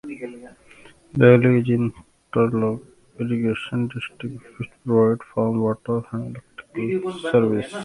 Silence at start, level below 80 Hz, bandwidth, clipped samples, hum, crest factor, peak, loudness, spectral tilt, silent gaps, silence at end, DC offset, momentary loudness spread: 0.05 s; -56 dBFS; 11.5 kHz; under 0.1%; none; 20 dB; 0 dBFS; -21 LUFS; -8.5 dB/octave; none; 0 s; under 0.1%; 18 LU